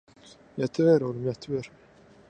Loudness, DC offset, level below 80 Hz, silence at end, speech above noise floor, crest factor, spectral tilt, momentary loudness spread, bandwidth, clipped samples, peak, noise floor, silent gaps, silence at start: -26 LUFS; under 0.1%; -64 dBFS; 0.6 s; 28 dB; 18 dB; -7.5 dB/octave; 17 LU; 9 kHz; under 0.1%; -10 dBFS; -54 dBFS; none; 0.55 s